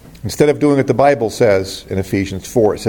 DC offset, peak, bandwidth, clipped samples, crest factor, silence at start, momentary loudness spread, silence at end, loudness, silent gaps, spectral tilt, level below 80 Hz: under 0.1%; 0 dBFS; 17.5 kHz; under 0.1%; 14 dB; 0.05 s; 9 LU; 0 s; -15 LUFS; none; -6 dB/octave; -44 dBFS